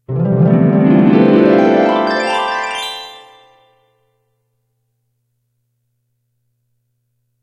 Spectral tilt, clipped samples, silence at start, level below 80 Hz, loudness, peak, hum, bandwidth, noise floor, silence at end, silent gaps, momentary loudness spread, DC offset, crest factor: -7.5 dB/octave; under 0.1%; 0.1 s; -56 dBFS; -12 LUFS; 0 dBFS; none; 12.5 kHz; -67 dBFS; 4.25 s; none; 12 LU; under 0.1%; 16 dB